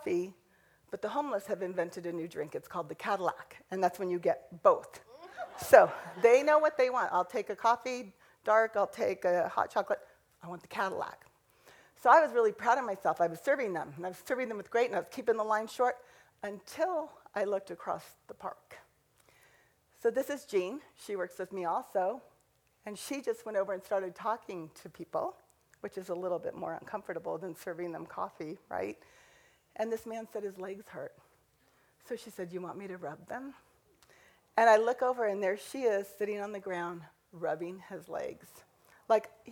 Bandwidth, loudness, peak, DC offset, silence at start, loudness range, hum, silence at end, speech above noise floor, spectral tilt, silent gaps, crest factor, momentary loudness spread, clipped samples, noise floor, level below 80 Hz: 19 kHz; -32 LUFS; -6 dBFS; under 0.1%; 0 s; 14 LU; none; 0 s; 39 dB; -4.5 dB/octave; none; 28 dB; 18 LU; under 0.1%; -71 dBFS; -76 dBFS